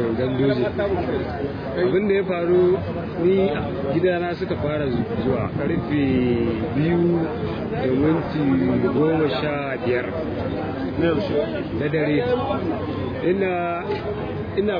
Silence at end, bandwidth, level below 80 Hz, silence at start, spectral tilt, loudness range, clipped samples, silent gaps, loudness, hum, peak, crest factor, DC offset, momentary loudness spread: 0 s; 5.2 kHz; -44 dBFS; 0 s; -9.5 dB/octave; 2 LU; under 0.1%; none; -22 LUFS; none; -8 dBFS; 14 dB; under 0.1%; 7 LU